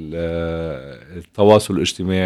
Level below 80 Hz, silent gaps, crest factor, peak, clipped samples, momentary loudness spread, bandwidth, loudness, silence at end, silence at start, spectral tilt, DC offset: -42 dBFS; none; 18 dB; 0 dBFS; under 0.1%; 21 LU; 13.5 kHz; -18 LUFS; 0 s; 0 s; -5.5 dB/octave; under 0.1%